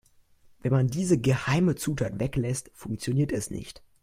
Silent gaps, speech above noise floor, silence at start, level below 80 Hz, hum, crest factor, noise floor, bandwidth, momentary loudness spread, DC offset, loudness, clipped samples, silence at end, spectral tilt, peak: none; 32 dB; 0.65 s; -50 dBFS; none; 18 dB; -58 dBFS; 15.5 kHz; 11 LU; under 0.1%; -27 LUFS; under 0.1%; 0.3 s; -6 dB/octave; -10 dBFS